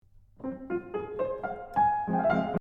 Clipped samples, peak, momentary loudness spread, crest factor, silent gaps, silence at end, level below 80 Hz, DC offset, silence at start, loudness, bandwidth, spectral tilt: under 0.1%; -14 dBFS; 13 LU; 16 dB; none; 0 s; -56 dBFS; under 0.1%; 0.4 s; -30 LUFS; 6.4 kHz; -9 dB/octave